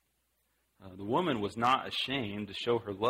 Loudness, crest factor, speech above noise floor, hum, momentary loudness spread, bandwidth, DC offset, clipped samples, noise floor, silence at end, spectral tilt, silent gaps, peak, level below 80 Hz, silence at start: -32 LUFS; 20 dB; 45 dB; none; 9 LU; 16 kHz; under 0.1%; under 0.1%; -77 dBFS; 0 s; -5.5 dB/octave; none; -14 dBFS; -66 dBFS; 0.8 s